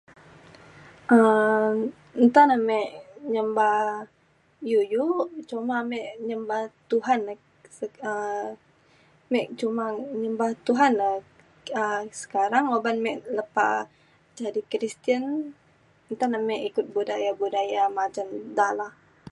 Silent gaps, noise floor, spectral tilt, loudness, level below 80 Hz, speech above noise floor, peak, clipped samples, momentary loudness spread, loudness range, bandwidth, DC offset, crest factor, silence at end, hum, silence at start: none; -60 dBFS; -5 dB/octave; -25 LUFS; -74 dBFS; 36 dB; -4 dBFS; under 0.1%; 14 LU; 8 LU; 11 kHz; under 0.1%; 20 dB; 0.4 s; none; 0.75 s